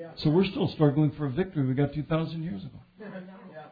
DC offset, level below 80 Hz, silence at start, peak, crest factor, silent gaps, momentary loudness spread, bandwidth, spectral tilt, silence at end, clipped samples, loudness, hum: under 0.1%; -54 dBFS; 0 s; -8 dBFS; 20 dB; none; 21 LU; 5 kHz; -10 dB/octave; 0.05 s; under 0.1%; -27 LUFS; none